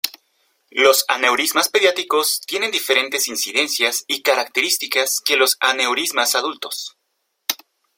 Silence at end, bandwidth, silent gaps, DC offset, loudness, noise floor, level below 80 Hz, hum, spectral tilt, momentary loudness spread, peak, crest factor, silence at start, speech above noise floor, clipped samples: 0.4 s; 16.5 kHz; none; under 0.1%; -17 LUFS; -72 dBFS; -70 dBFS; none; 1 dB/octave; 11 LU; 0 dBFS; 20 dB; 0.05 s; 53 dB; under 0.1%